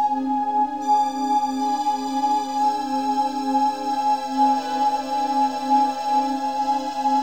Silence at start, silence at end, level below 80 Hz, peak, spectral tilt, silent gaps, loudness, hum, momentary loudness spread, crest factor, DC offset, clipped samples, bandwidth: 0 s; 0 s; -62 dBFS; -8 dBFS; -3 dB/octave; none; -22 LUFS; 50 Hz at -65 dBFS; 3 LU; 12 dB; 0.4%; under 0.1%; 16 kHz